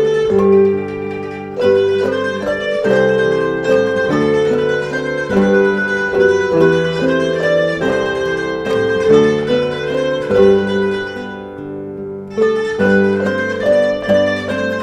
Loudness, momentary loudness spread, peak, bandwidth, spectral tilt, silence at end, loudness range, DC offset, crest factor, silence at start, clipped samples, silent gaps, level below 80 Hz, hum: -15 LUFS; 11 LU; 0 dBFS; 9.8 kHz; -6 dB/octave; 0 s; 3 LU; under 0.1%; 14 dB; 0 s; under 0.1%; none; -46 dBFS; none